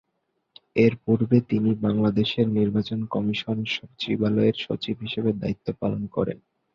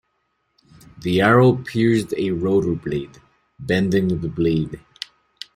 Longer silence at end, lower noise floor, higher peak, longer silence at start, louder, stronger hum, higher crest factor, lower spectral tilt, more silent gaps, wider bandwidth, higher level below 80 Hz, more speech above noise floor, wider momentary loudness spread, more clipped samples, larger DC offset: second, 0.4 s vs 0.8 s; first, -75 dBFS vs -70 dBFS; second, -6 dBFS vs -2 dBFS; second, 0.75 s vs 1 s; second, -24 LUFS vs -20 LUFS; neither; about the same, 18 dB vs 18 dB; about the same, -8 dB/octave vs -7 dB/octave; neither; second, 6.8 kHz vs 15.5 kHz; second, -54 dBFS vs -48 dBFS; about the same, 52 dB vs 52 dB; second, 8 LU vs 20 LU; neither; neither